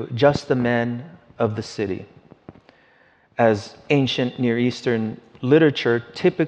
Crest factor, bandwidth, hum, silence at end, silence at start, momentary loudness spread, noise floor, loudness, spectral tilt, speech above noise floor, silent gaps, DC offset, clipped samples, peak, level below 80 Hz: 20 dB; 9 kHz; none; 0 s; 0 s; 11 LU; -57 dBFS; -21 LUFS; -6.5 dB/octave; 36 dB; none; under 0.1%; under 0.1%; -2 dBFS; -58 dBFS